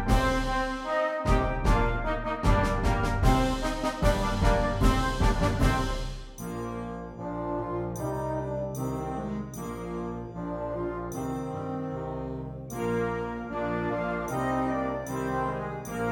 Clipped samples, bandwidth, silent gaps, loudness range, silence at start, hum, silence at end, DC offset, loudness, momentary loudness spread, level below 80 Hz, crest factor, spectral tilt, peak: under 0.1%; 17.5 kHz; none; 7 LU; 0 s; none; 0 s; under 0.1%; -29 LUFS; 10 LU; -34 dBFS; 18 dB; -6 dB/octave; -10 dBFS